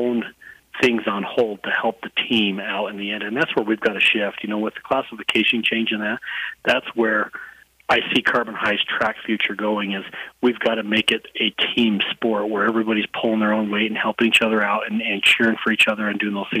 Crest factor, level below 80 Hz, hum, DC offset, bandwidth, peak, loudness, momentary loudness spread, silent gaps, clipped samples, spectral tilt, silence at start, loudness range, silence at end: 16 dB; -62 dBFS; none; under 0.1%; 15.5 kHz; -6 dBFS; -20 LUFS; 8 LU; none; under 0.1%; -4 dB/octave; 0 s; 3 LU; 0 s